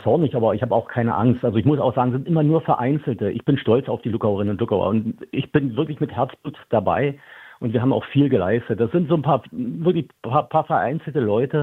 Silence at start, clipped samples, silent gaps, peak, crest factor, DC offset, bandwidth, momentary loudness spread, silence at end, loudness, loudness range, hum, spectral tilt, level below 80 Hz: 0 s; under 0.1%; none; -4 dBFS; 18 dB; under 0.1%; 4.1 kHz; 6 LU; 0 s; -21 LUFS; 3 LU; none; -10 dB/octave; -56 dBFS